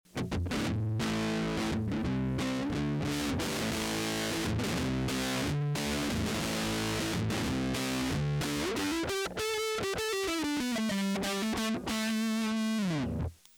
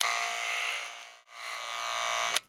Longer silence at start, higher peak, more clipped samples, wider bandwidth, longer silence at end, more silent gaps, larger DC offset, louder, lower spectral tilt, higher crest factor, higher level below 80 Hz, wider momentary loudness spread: first, 0.15 s vs 0 s; second, -20 dBFS vs -10 dBFS; neither; about the same, 20 kHz vs over 20 kHz; first, 0.25 s vs 0.05 s; neither; neither; about the same, -32 LUFS vs -32 LUFS; first, -4.5 dB/octave vs 2.5 dB/octave; second, 12 dB vs 24 dB; first, -48 dBFS vs -74 dBFS; second, 1 LU vs 14 LU